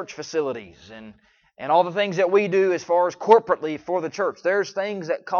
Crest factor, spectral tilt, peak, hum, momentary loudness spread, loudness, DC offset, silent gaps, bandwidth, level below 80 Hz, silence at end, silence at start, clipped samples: 22 dB; -5 dB/octave; -2 dBFS; none; 15 LU; -22 LUFS; under 0.1%; none; 7.2 kHz; -68 dBFS; 0 s; 0 s; under 0.1%